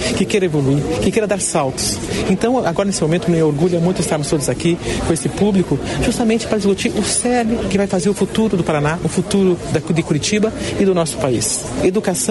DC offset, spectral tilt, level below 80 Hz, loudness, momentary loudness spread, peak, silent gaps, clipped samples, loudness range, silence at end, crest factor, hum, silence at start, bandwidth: under 0.1%; -5 dB/octave; -36 dBFS; -17 LUFS; 3 LU; -2 dBFS; none; under 0.1%; 0 LU; 0 s; 14 dB; none; 0 s; 12 kHz